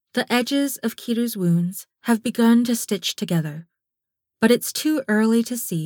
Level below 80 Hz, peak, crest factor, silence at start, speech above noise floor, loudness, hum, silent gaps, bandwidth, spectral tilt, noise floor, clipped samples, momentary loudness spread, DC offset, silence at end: -70 dBFS; -4 dBFS; 18 dB; 0.15 s; 64 dB; -21 LUFS; none; none; 20 kHz; -5 dB/octave; -84 dBFS; under 0.1%; 7 LU; under 0.1%; 0 s